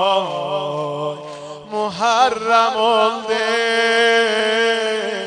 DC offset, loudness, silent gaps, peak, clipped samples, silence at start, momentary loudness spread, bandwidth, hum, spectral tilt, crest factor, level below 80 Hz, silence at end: under 0.1%; -17 LUFS; none; -2 dBFS; under 0.1%; 0 s; 11 LU; 10 kHz; none; -2.5 dB/octave; 16 dB; -66 dBFS; 0 s